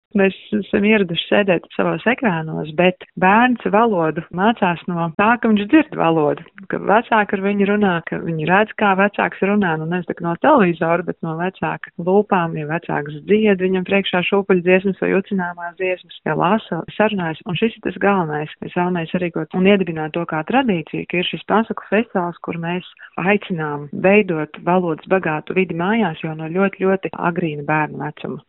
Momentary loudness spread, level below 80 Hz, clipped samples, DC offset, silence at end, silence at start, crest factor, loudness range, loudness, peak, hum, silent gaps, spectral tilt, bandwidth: 9 LU; -56 dBFS; under 0.1%; under 0.1%; 0.1 s; 0.15 s; 18 dB; 3 LU; -18 LUFS; 0 dBFS; none; none; -4.5 dB/octave; 4 kHz